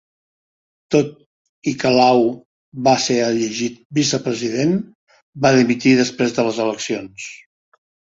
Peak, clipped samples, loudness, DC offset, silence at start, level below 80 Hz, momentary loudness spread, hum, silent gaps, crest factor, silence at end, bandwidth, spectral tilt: -2 dBFS; under 0.1%; -18 LUFS; under 0.1%; 0.9 s; -58 dBFS; 13 LU; none; 1.26-1.62 s, 2.45-2.72 s, 3.85-3.90 s, 4.95-5.07 s, 5.22-5.33 s; 18 dB; 0.85 s; 7.8 kHz; -4.5 dB/octave